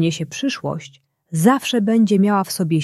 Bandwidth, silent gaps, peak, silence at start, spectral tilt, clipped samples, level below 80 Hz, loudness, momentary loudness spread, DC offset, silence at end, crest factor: 14 kHz; none; -2 dBFS; 0 s; -5.5 dB/octave; under 0.1%; -62 dBFS; -18 LUFS; 12 LU; under 0.1%; 0 s; 16 dB